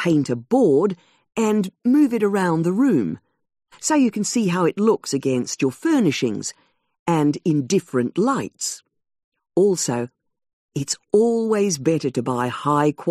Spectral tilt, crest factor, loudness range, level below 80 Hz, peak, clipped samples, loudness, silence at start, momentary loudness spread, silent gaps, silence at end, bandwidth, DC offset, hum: -5.5 dB/octave; 16 dB; 3 LU; -64 dBFS; -4 dBFS; under 0.1%; -20 LUFS; 0 s; 10 LU; 6.99-7.06 s, 9.24-9.32 s, 10.53-10.69 s; 0 s; 14.5 kHz; under 0.1%; none